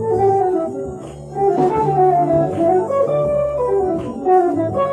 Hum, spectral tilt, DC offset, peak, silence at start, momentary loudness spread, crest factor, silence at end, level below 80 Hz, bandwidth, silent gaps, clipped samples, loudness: none; -9 dB/octave; under 0.1%; -4 dBFS; 0 s; 8 LU; 12 dB; 0 s; -44 dBFS; 9.6 kHz; none; under 0.1%; -17 LUFS